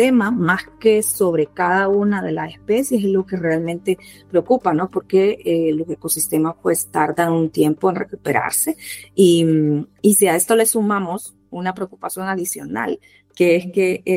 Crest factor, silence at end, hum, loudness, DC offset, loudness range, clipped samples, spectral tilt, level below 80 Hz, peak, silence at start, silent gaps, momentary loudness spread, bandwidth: 16 dB; 0 s; none; -18 LUFS; under 0.1%; 3 LU; under 0.1%; -4.5 dB/octave; -58 dBFS; -2 dBFS; 0 s; none; 11 LU; 16 kHz